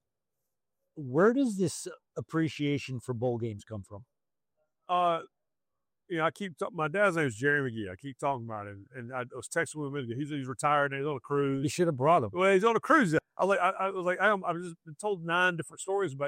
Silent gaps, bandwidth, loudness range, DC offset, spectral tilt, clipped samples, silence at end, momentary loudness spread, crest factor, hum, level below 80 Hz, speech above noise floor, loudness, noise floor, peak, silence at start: none; 16 kHz; 8 LU; under 0.1%; -5.5 dB/octave; under 0.1%; 0 s; 15 LU; 20 dB; none; -74 dBFS; over 60 dB; -30 LUFS; under -90 dBFS; -10 dBFS; 0.95 s